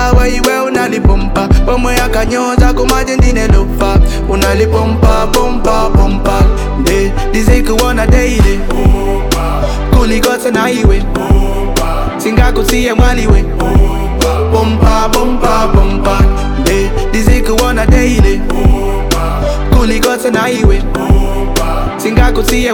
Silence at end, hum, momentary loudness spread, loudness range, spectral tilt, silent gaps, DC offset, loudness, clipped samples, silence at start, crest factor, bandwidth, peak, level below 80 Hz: 0 s; none; 4 LU; 1 LU; -5.5 dB/octave; none; under 0.1%; -11 LUFS; under 0.1%; 0 s; 8 dB; 19 kHz; 0 dBFS; -12 dBFS